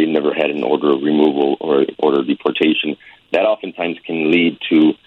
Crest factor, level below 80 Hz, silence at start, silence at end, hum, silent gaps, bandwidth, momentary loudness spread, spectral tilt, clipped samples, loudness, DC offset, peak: 14 dB; -64 dBFS; 0 s; 0.15 s; none; none; 4.4 kHz; 7 LU; -7.5 dB/octave; under 0.1%; -16 LUFS; under 0.1%; -2 dBFS